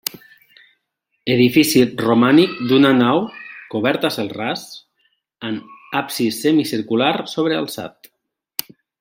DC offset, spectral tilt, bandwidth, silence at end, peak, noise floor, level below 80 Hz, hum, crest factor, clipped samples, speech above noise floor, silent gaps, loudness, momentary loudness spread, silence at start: under 0.1%; -5 dB/octave; 16.5 kHz; 1.1 s; 0 dBFS; -73 dBFS; -60 dBFS; none; 18 dB; under 0.1%; 56 dB; none; -18 LUFS; 16 LU; 1.25 s